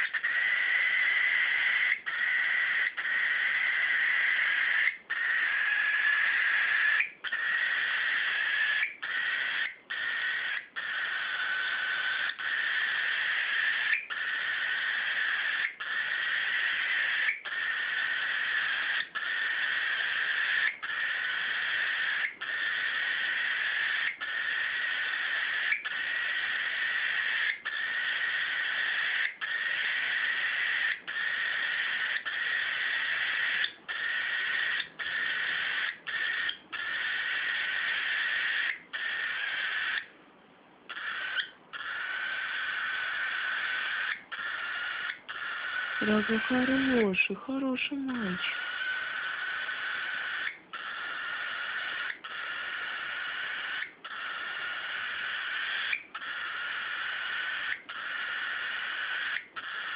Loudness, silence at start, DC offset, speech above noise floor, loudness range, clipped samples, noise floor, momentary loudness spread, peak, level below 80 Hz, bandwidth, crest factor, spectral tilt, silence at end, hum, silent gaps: -29 LUFS; 0 s; under 0.1%; 29 dB; 7 LU; under 0.1%; -57 dBFS; 9 LU; -14 dBFS; -74 dBFS; 5.2 kHz; 18 dB; -6 dB/octave; 0 s; none; none